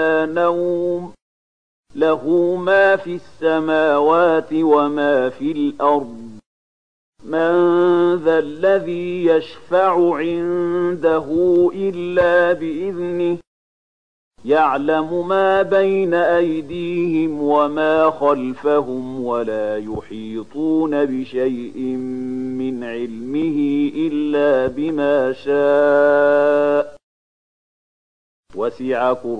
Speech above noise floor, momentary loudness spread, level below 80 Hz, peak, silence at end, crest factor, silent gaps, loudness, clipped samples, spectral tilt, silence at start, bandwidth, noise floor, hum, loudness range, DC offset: over 73 dB; 11 LU; -56 dBFS; -2 dBFS; 0 s; 16 dB; 1.22-1.83 s, 6.46-7.13 s, 13.47-14.31 s, 27.03-28.43 s; -18 LUFS; under 0.1%; -7.5 dB/octave; 0 s; 9.2 kHz; under -90 dBFS; none; 5 LU; 0.7%